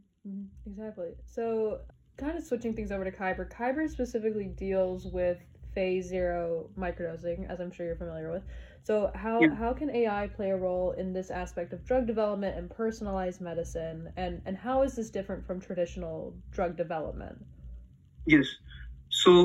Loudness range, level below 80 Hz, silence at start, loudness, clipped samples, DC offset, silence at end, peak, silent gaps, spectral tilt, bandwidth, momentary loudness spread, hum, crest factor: 5 LU; -48 dBFS; 0.25 s; -32 LUFS; under 0.1%; under 0.1%; 0 s; -6 dBFS; none; -5.5 dB/octave; 12.5 kHz; 15 LU; none; 24 dB